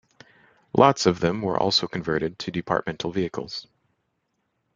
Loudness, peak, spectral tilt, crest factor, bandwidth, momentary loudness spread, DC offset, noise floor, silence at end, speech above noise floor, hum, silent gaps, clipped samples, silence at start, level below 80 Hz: -23 LUFS; -2 dBFS; -5 dB/octave; 24 dB; 9.4 kHz; 12 LU; under 0.1%; -75 dBFS; 1.15 s; 51 dB; none; none; under 0.1%; 0.75 s; -58 dBFS